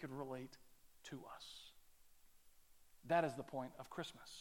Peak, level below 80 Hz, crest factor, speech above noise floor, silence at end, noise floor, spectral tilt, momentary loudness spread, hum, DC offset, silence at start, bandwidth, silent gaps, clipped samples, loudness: -24 dBFS; -76 dBFS; 24 dB; 21 dB; 0 s; -66 dBFS; -5 dB/octave; 22 LU; none; under 0.1%; 0 s; 17.5 kHz; none; under 0.1%; -46 LUFS